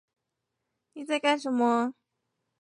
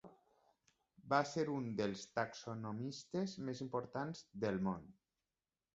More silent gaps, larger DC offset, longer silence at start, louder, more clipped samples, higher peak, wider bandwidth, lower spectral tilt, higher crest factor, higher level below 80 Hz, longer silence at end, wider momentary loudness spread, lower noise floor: neither; neither; first, 0.95 s vs 0.05 s; first, -27 LUFS vs -42 LUFS; neither; first, -12 dBFS vs -20 dBFS; first, 11 kHz vs 8 kHz; second, -3.5 dB/octave vs -5.5 dB/octave; about the same, 20 dB vs 24 dB; second, -84 dBFS vs -74 dBFS; about the same, 0.7 s vs 0.8 s; about the same, 9 LU vs 9 LU; second, -83 dBFS vs under -90 dBFS